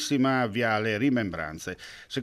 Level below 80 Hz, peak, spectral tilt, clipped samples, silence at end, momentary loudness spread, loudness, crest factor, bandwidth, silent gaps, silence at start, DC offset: -60 dBFS; -12 dBFS; -5 dB/octave; under 0.1%; 0 s; 13 LU; -27 LUFS; 14 dB; 14 kHz; none; 0 s; under 0.1%